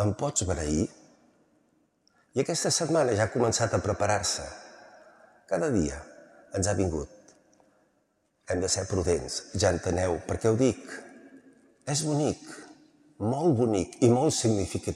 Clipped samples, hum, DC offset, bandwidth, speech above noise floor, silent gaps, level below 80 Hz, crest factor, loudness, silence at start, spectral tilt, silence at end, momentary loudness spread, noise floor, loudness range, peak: under 0.1%; none; under 0.1%; 14 kHz; 45 dB; none; -52 dBFS; 20 dB; -27 LUFS; 0 s; -4.5 dB/octave; 0 s; 12 LU; -72 dBFS; 5 LU; -8 dBFS